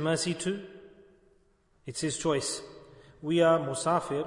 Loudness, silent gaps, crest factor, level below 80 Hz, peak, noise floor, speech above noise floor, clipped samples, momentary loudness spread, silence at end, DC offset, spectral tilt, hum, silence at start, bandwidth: -29 LUFS; none; 18 dB; -66 dBFS; -14 dBFS; -66 dBFS; 38 dB; under 0.1%; 18 LU; 0 s; under 0.1%; -4.5 dB/octave; none; 0 s; 11 kHz